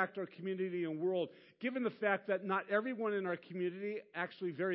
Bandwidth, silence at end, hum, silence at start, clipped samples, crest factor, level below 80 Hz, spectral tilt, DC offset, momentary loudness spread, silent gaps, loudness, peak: 5.6 kHz; 0 s; none; 0 s; under 0.1%; 20 dB; under -90 dBFS; -4.5 dB/octave; under 0.1%; 7 LU; none; -38 LUFS; -18 dBFS